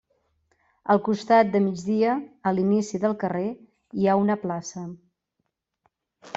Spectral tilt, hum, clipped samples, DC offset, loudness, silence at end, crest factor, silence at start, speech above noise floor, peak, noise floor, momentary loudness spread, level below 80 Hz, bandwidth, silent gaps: -6.5 dB/octave; none; under 0.1%; under 0.1%; -24 LUFS; 0.05 s; 18 dB; 0.85 s; 56 dB; -6 dBFS; -79 dBFS; 16 LU; -66 dBFS; 7.8 kHz; none